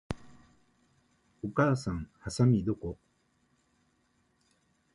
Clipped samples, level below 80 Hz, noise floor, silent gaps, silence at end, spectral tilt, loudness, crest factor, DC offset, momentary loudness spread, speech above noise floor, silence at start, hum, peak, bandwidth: under 0.1%; -54 dBFS; -72 dBFS; none; 2 s; -7 dB/octave; -31 LUFS; 22 dB; under 0.1%; 16 LU; 43 dB; 0.1 s; none; -12 dBFS; 11.5 kHz